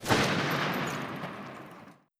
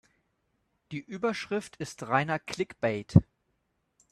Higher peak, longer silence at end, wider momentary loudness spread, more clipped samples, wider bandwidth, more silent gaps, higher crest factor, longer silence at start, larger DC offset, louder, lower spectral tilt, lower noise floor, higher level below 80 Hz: second, -10 dBFS vs -4 dBFS; second, 0.25 s vs 0.9 s; first, 21 LU vs 15 LU; neither; first, 16.5 kHz vs 12.5 kHz; neither; second, 20 dB vs 28 dB; second, 0 s vs 0.9 s; neither; about the same, -30 LUFS vs -29 LUFS; second, -4.5 dB/octave vs -6.5 dB/octave; second, -52 dBFS vs -77 dBFS; second, -60 dBFS vs -54 dBFS